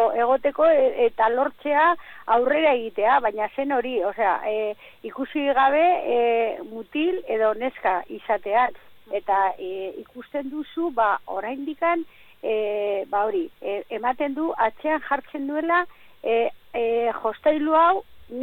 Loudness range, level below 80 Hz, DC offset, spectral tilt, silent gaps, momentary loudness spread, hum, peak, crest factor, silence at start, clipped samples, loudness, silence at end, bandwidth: 5 LU; -60 dBFS; under 0.1%; -6 dB/octave; none; 12 LU; none; -8 dBFS; 16 dB; 0 s; under 0.1%; -23 LUFS; 0 s; 16.5 kHz